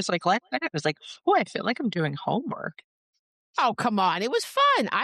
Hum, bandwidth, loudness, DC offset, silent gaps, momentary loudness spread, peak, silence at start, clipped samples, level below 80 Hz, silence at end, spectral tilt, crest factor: none; 13 kHz; -26 LUFS; under 0.1%; 2.84-3.13 s, 3.19-3.54 s; 9 LU; -12 dBFS; 0 s; under 0.1%; -74 dBFS; 0 s; -4.5 dB/octave; 14 dB